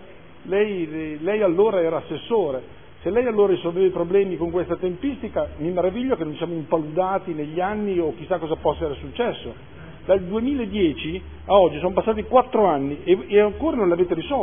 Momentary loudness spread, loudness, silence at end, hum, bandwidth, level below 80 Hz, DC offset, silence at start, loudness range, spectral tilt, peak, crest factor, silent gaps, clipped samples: 10 LU; -22 LUFS; 0 s; none; 3.6 kHz; -46 dBFS; 0.5%; 0 s; 5 LU; -11 dB/octave; -2 dBFS; 18 dB; none; under 0.1%